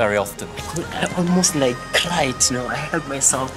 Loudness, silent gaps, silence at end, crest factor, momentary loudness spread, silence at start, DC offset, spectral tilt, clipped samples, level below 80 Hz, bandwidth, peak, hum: -19 LUFS; none; 0 s; 18 dB; 10 LU; 0 s; under 0.1%; -3 dB/octave; under 0.1%; -44 dBFS; 16 kHz; -2 dBFS; none